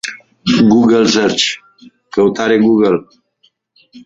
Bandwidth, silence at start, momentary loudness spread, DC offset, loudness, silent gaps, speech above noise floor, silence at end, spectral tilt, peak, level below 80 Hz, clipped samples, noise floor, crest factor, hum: 8.8 kHz; 0.05 s; 12 LU; under 0.1%; -12 LUFS; none; 46 dB; 0.05 s; -4.5 dB/octave; 0 dBFS; -50 dBFS; under 0.1%; -58 dBFS; 14 dB; none